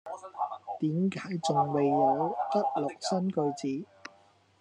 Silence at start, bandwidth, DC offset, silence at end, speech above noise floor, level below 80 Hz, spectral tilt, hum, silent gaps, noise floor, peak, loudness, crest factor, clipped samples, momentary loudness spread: 0.05 s; 10.5 kHz; under 0.1%; 0.55 s; 34 dB; -84 dBFS; -6.5 dB/octave; none; none; -62 dBFS; -14 dBFS; -30 LUFS; 18 dB; under 0.1%; 13 LU